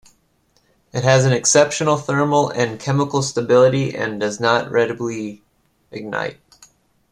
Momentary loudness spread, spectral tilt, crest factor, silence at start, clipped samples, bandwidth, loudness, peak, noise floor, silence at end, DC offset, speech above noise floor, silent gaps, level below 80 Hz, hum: 14 LU; -4.5 dB/octave; 18 dB; 0.95 s; under 0.1%; 11.5 kHz; -18 LUFS; -2 dBFS; -61 dBFS; 0.8 s; under 0.1%; 44 dB; none; -56 dBFS; none